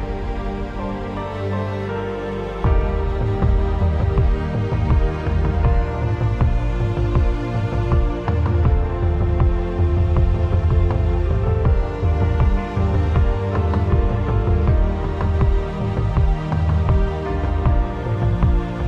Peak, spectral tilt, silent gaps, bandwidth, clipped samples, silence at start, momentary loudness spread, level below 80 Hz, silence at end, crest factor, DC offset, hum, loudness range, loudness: -4 dBFS; -9 dB/octave; none; 6.4 kHz; under 0.1%; 0 s; 6 LU; -20 dBFS; 0 s; 14 dB; under 0.1%; none; 2 LU; -20 LUFS